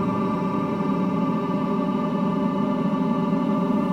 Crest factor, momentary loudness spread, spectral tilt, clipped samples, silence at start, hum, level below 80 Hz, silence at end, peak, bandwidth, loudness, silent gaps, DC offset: 12 dB; 2 LU; -9 dB/octave; under 0.1%; 0 s; none; -54 dBFS; 0 s; -12 dBFS; 7.8 kHz; -23 LUFS; none; under 0.1%